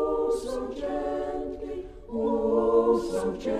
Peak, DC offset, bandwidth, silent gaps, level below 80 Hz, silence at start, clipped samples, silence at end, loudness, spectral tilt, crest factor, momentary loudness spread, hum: -10 dBFS; under 0.1%; 12 kHz; none; -46 dBFS; 0 s; under 0.1%; 0 s; -27 LUFS; -6.5 dB/octave; 16 dB; 13 LU; none